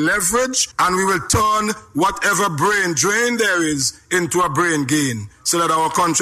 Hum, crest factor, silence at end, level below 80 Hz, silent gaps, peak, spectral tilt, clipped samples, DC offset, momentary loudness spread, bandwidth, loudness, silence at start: none; 12 dB; 0 s; -44 dBFS; none; -6 dBFS; -3 dB/octave; under 0.1%; under 0.1%; 4 LU; 16 kHz; -17 LUFS; 0 s